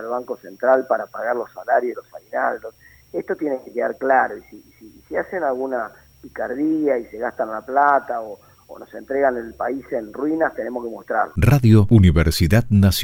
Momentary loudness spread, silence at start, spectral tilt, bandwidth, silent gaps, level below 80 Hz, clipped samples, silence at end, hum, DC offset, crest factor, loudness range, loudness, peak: 15 LU; 0 s; -7 dB/octave; 17.5 kHz; none; -36 dBFS; under 0.1%; 0 s; none; under 0.1%; 18 dB; 7 LU; -20 LUFS; -2 dBFS